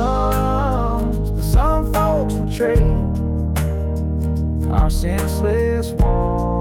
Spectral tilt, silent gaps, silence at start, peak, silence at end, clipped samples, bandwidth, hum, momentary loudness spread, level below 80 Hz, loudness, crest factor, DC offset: -7.5 dB/octave; none; 0 s; -4 dBFS; 0 s; under 0.1%; 17 kHz; none; 4 LU; -20 dBFS; -19 LUFS; 12 dB; 0.1%